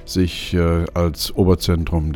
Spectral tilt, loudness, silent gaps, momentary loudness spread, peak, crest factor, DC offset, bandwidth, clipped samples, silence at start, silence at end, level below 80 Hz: -6 dB/octave; -19 LUFS; none; 4 LU; -2 dBFS; 16 dB; under 0.1%; 20 kHz; under 0.1%; 0 s; 0 s; -28 dBFS